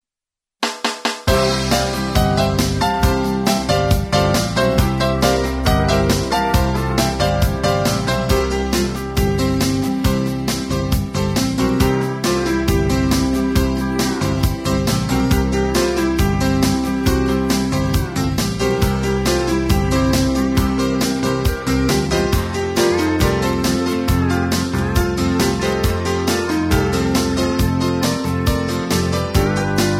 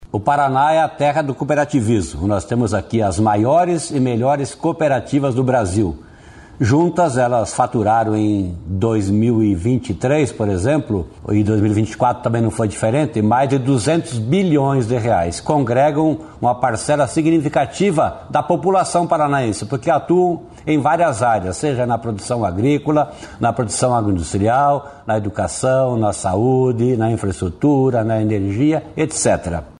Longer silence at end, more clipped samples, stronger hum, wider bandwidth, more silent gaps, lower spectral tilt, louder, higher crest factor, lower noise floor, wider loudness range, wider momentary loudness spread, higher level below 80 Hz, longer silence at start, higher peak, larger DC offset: about the same, 0 s vs 0.1 s; neither; neither; first, 16.5 kHz vs 11.5 kHz; neither; about the same, -5.5 dB/octave vs -6.5 dB/octave; about the same, -18 LUFS vs -17 LUFS; about the same, 16 dB vs 14 dB; first, -88 dBFS vs -40 dBFS; about the same, 2 LU vs 1 LU; about the same, 3 LU vs 5 LU; first, -26 dBFS vs -42 dBFS; first, 0.6 s vs 0 s; about the same, 0 dBFS vs -2 dBFS; neither